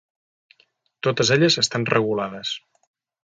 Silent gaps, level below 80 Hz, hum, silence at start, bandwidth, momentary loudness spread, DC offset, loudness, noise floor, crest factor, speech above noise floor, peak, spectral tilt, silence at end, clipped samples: none; -62 dBFS; none; 1.05 s; 9.4 kHz; 13 LU; under 0.1%; -20 LUFS; -64 dBFS; 22 dB; 43 dB; -2 dBFS; -4 dB/octave; 0.65 s; under 0.1%